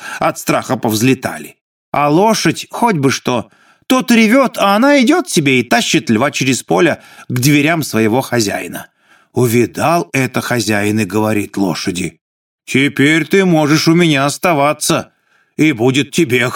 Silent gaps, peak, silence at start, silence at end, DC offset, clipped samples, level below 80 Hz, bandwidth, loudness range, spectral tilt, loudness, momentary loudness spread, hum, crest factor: 1.61-1.92 s, 12.21-12.58 s; 0 dBFS; 0 s; 0 s; under 0.1%; under 0.1%; -56 dBFS; 18.5 kHz; 4 LU; -4.5 dB/octave; -13 LUFS; 8 LU; none; 14 dB